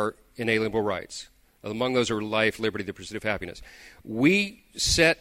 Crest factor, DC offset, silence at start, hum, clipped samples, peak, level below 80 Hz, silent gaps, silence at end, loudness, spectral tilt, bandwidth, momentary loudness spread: 20 dB; under 0.1%; 0 s; none; under 0.1%; -6 dBFS; -48 dBFS; none; 0.05 s; -26 LUFS; -3.5 dB/octave; 16 kHz; 18 LU